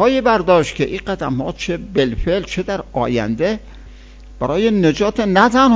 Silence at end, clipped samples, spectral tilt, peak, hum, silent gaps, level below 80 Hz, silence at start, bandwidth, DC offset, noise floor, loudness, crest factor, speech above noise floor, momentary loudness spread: 0 s; under 0.1%; -6 dB/octave; 0 dBFS; none; none; -36 dBFS; 0 s; 7.8 kHz; under 0.1%; -38 dBFS; -17 LUFS; 16 dB; 22 dB; 9 LU